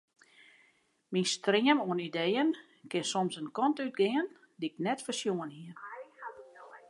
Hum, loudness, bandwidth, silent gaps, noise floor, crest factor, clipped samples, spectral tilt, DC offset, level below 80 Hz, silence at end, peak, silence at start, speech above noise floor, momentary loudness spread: none; -32 LUFS; 11.5 kHz; none; -70 dBFS; 22 dB; under 0.1%; -4 dB/octave; under 0.1%; -86 dBFS; 0.1 s; -12 dBFS; 1.1 s; 39 dB; 19 LU